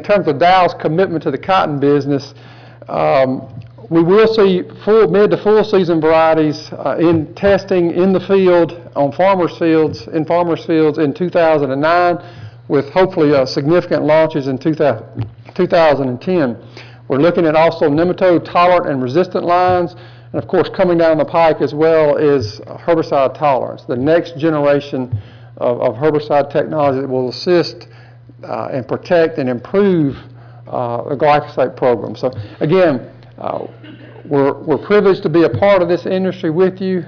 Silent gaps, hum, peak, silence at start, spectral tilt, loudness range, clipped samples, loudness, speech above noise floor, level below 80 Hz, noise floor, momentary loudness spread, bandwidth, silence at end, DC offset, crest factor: none; none; -4 dBFS; 0 s; -8 dB/octave; 4 LU; under 0.1%; -14 LUFS; 21 dB; -48 dBFS; -35 dBFS; 10 LU; 5.4 kHz; 0.05 s; under 0.1%; 10 dB